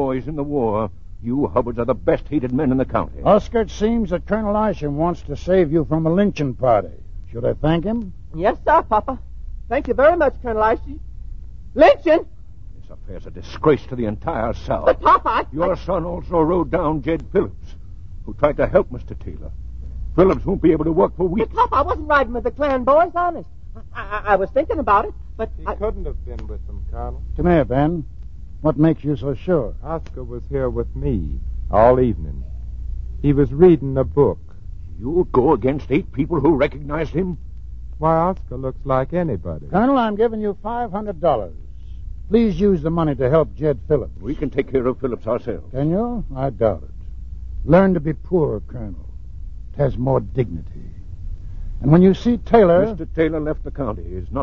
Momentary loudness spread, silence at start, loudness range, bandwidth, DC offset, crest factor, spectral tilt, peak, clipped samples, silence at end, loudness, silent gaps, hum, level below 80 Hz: 20 LU; 0 s; 4 LU; 7 kHz; 1%; 20 dB; -9 dB/octave; 0 dBFS; under 0.1%; 0 s; -19 LUFS; none; none; -32 dBFS